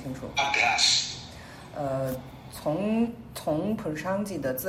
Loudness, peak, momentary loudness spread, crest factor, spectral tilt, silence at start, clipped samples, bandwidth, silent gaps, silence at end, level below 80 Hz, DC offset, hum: -27 LUFS; -8 dBFS; 18 LU; 20 dB; -3 dB/octave; 0 s; under 0.1%; 16 kHz; none; 0 s; -54 dBFS; under 0.1%; none